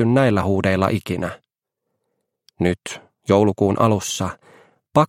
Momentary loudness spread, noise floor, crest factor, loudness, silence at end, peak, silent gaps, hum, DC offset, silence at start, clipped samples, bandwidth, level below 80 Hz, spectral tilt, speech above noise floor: 13 LU; -79 dBFS; 18 dB; -20 LUFS; 0.05 s; -2 dBFS; none; none; under 0.1%; 0 s; under 0.1%; 16 kHz; -52 dBFS; -6 dB/octave; 60 dB